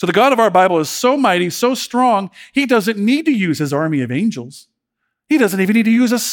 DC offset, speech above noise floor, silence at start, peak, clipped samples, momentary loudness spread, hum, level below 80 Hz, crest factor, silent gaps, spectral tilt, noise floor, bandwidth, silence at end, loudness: under 0.1%; 60 dB; 0 s; 0 dBFS; under 0.1%; 7 LU; none; -64 dBFS; 14 dB; none; -5 dB/octave; -75 dBFS; 18.5 kHz; 0 s; -15 LUFS